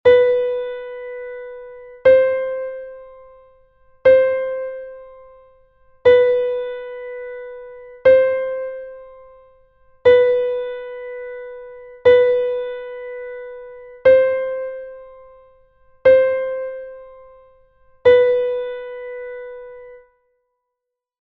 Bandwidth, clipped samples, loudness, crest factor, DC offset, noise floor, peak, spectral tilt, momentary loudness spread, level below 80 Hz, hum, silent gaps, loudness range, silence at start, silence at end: 4.4 kHz; under 0.1%; -16 LUFS; 18 dB; under 0.1%; -82 dBFS; -2 dBFS; -6 dB/octave; 23 LU; -54 dBFS; none; none; 3 LU; 0.05 s; 1.25 s